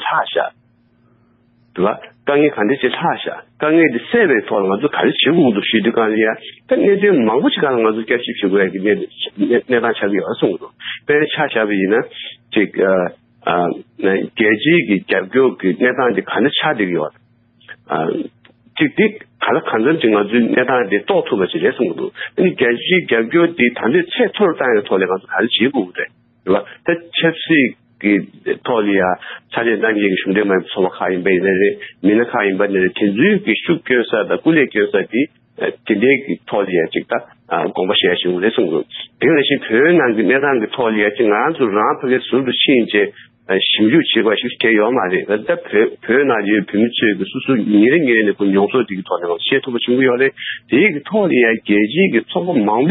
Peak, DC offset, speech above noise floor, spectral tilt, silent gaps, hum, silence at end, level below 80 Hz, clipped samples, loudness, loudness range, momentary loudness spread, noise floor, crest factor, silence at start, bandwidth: -2 dBFS; under 0.1%; 40 dB; -11 dB/octave; none; none; 0 s; -60 dBFS; under 0.1%; -15 LUFS; 3 LU; 8 LU; -55 dBFS; 14 dB; 0 s; 4.1 kHz